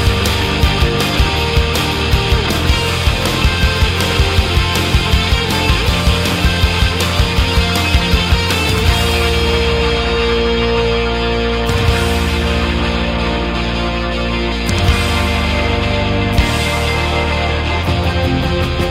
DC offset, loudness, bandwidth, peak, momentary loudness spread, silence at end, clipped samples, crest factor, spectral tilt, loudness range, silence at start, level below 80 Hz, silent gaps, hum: under 0.1%; -14 LUFS; 16 kHz; -2 dBFS; 3 LU; 0 s; under 0.1%; 12 dB; -5 dB/octave; 2 LU; 0 s; -18 dBFS; none; none